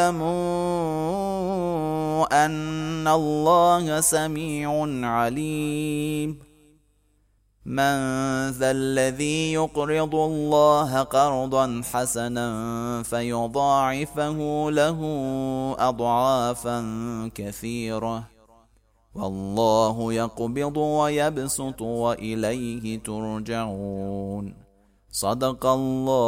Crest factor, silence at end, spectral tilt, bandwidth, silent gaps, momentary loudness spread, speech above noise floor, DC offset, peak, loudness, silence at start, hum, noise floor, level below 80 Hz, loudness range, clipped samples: 18 dB; 0 s; -5 dB/octave; 16 kHz; none; 10 LU; 40 dB; under 0.1%; -6 dBFS; -24 LUFS; 0 s; none; -64 dBFS; -50 dBFS; 6 LU; under 0.1%